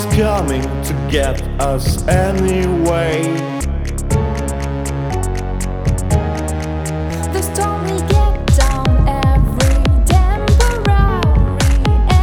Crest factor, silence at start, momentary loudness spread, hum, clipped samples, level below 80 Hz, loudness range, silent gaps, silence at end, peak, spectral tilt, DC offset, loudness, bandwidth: 14 dB; 0 s; 7 LU; none; under 0.1%; -18 dBFS; 5 LU; none; 0 s; 0 dBFS; -6 dB/octave; under 0.1%; -16 LUFS; 17 kHz